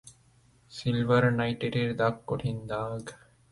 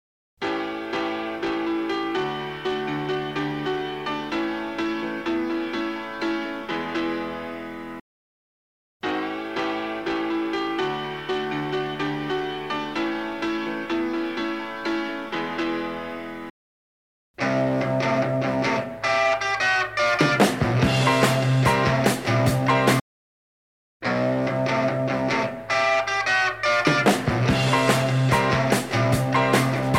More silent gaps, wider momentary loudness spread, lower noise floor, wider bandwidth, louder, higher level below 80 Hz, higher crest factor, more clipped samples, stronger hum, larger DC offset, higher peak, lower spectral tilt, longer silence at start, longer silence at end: second, none vs 8.01-9.00 s, 16.50-17.34 s, 23.01-24.00 s; first, 14 LU vs 9 LU; second, -62 dBFS vs under -90 dBFS; second, 11.5 kHz vs 16.5 kHz; second, -29 LUFS vs -24 LUFS; second, -58 dBFS vs -50 dBFS; about the same, 18 dB vs 20 dB; neither; neither; second, under 0.1% vs 0.2%; second, -10 dBFS vs -4 dBFS; first, -7 dB/octave vs -5.5 dB/octave; second, 0.05 s vs 0.4 s; first, 0.35 s vs 0 s